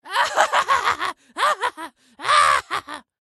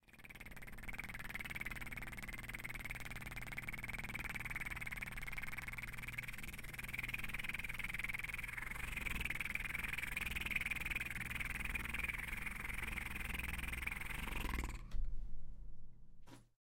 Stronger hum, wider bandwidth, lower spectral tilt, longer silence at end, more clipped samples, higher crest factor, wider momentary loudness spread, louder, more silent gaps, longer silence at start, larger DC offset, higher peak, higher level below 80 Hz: neither; second, 12.5 kHz vs 17 kHz; second, 0 dB/octave vs -3 dB/octave; about the same, 0.2 s vs 0.2 s; neither; about the same, 20 dB vs 20 dB; first, 15 LU vs 9 LU; first, -20 LUFS vs -44 LUFS; neither; about the same, 0.05 s vs 0.1 s; neither; first, 0 dBFS vs -24 dBFS; second, -58 dBFS vs -50 dBFS